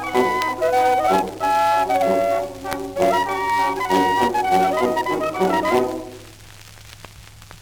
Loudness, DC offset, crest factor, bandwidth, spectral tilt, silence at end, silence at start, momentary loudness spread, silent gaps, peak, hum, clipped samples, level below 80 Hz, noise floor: -19 LUFS; under 0.1%; 16 dB; over 20 kHz; -4.5 dB/octave; 0 s; 0 s; 10 LU; none; -4 dBFS; none; under 0.1%; -48 dBFS; -42 dBFS